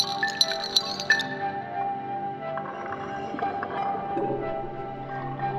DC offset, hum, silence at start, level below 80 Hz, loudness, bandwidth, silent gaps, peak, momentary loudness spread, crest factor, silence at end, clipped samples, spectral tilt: under 0.1%; none; 0 s; -56 dBFS; -28 LUFS; 15.5 kHz; none; -4 dBFS; 11 LU; 24 dB; 0 s; under 0.1%; -3 dB/octave